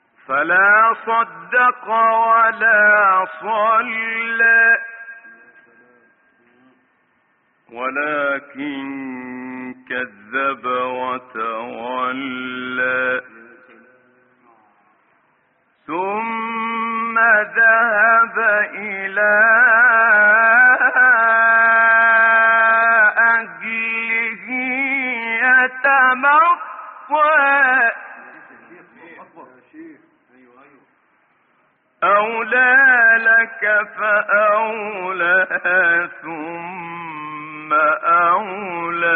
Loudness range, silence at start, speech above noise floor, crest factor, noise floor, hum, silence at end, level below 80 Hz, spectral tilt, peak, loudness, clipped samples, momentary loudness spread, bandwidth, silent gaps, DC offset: 14 LU; 0.3 s; 46 dB; 14 dB; -62 dBFS; none; 0 s; -74 dBFS; -0.5 dB/octave; -4 dBFS; -15 LUFS; under 0.1%; 16 LU; 4.1 kHz; none; under 0.1%